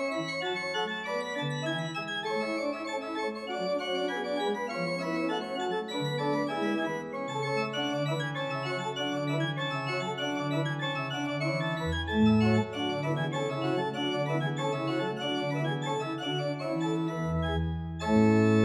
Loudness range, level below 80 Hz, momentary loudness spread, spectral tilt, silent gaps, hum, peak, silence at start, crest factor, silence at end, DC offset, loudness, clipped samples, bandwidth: 3 LU; -52 dBFS; 6 LU; -6 dB/octave; none; none; -14 dBFS; 0 s; 16 dB; 0 s; under 0.1%; -30 LUFS; under 0.1%; 12.5 kHz